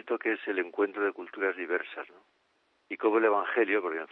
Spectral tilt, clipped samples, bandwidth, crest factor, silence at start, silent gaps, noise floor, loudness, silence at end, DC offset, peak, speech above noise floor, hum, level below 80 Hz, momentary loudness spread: -7 dB/octave; under 0.1%; 4.2 kHz; 18 dB; 0.05 s; none; -72 dBFS; -29 LUFS; 0.05 s; under 0.1%; -12 dBFS; 42 dB; none; -88 dBFS; 13 LU